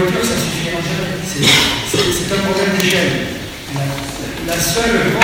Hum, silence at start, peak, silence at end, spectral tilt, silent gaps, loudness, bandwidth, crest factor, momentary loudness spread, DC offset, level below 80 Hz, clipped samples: none; 0 s; 0 dBFS; 0 s; -3.5 dB/octave; none; -15 LUFS; over 20 kHz; 16 dB; 12 LU; under 0.1%; -36 dBFS; under 0.1%